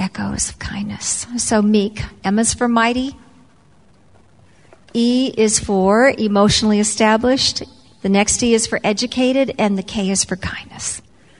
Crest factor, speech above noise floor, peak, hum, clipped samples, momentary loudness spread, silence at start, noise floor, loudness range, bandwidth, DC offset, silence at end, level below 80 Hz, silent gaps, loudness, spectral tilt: 16 dB; 35 dB; 0 dBFS; none; under 0.1%; 12 LU; 0 s; -52 dBFS; 5 LU; 11 kHz; 0.2%; 0.4 s; -42 dBFS; none; -17 LUFS; -3.5 dB/octave